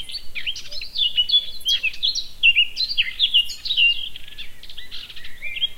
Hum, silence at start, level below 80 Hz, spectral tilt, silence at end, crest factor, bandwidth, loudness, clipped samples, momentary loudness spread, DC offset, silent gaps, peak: none; 0 s; -44 dBFS; 1.5 dB/octave; 0 s; 18 dB; 16.5 kHz; -18 LUFS; under 0.1%; 20 LU; under 0.1%; none; -4 dBFS